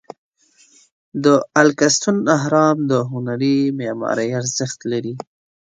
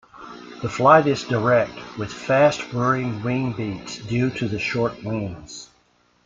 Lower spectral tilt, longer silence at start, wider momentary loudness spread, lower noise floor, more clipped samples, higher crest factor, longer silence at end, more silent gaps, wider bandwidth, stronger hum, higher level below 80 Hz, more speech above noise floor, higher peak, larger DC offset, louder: second, -4.5 dB/octave vs -6 dB/octave; first, 1.15 s vs 0.15 s; second, 10 LU vs 19 LU; second, -54 dBFS vs -61 dBFS; neither; about the same, 18 dB vs 20 dB; second, 0.4 s vs 0.6 s; neither; first, 9.4 kHz vs 7.8 kHz; neither; second, -64 dBFS vs -54 dBFS; about the same, 37 dB vs 40 dB; about the same, 0 dBFS vs -2 dBFS; neither; first, -18 LUFS vs -21 LUFS